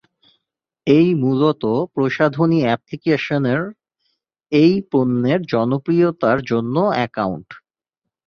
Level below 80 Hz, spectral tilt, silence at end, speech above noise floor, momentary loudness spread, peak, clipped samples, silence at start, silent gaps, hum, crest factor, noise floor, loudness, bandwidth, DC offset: -56 dBFS; -8.5 dB/octave; 0.7 s; 66 dB; 7 LU; -2 dBFS; under 0.1%; 0.85 s; none; none; 16 dB; -83 dBFS; -18 LUFS; 6.8 kHz; under 0.1%